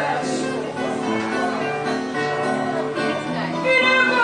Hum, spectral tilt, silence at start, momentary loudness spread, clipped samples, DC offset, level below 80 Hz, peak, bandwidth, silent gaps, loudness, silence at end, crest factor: none; -4.5 dB/octave; 0 s; 9 LU; under 0.1%; under 0.1%; -64 dBFS; -6 dBFS; 11 kHz; none; -21 LUFS; 0 s; 16 dB